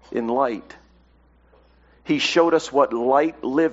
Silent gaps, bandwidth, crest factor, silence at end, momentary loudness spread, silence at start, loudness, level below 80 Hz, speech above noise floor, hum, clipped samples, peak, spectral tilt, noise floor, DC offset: none; 8 kHz; 18 dB; 0 s; 8 LU; 0.1 s; -20 LUFS; -58 dBFS; 36 dB; none; under 0.1%; -4 dBFS; -2.5 dB/octave; -56 dBFS; under 0.1%